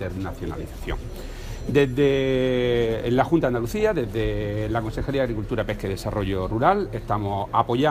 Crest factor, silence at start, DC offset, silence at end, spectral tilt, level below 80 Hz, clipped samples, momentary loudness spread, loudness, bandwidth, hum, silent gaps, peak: 20 dB; 0 s; under 0.1%; 0 s; -7 dB/octave; -36 dBFS; under 0.1%; 12 LU; -24 LUFS; 15.5 kHz; none; none; -4 dBFS